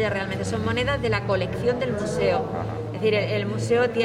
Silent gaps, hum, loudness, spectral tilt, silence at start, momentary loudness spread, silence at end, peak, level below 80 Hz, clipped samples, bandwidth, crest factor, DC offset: none; none; -24 LUFS; -6 dB/octave; 0 s; 5 LU; 0 s; -10 dBFS; -46 dBFS; under 0.1%; 13 kHz; 14 dB; under 0.1%